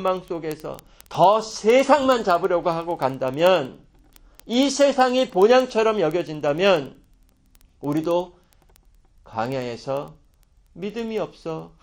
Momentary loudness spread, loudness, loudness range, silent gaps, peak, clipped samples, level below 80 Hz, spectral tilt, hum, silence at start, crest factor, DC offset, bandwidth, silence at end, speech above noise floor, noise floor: 16 LU; -21 LUFS; 10 LU; none; -2 dBFS; under 0.1%; -56 dBFS; -4.5 dB/octave; none; 0 s; 20 dB; under 0.1%; 17 kHz; 0.15 s; 36 dB; -57 dBFS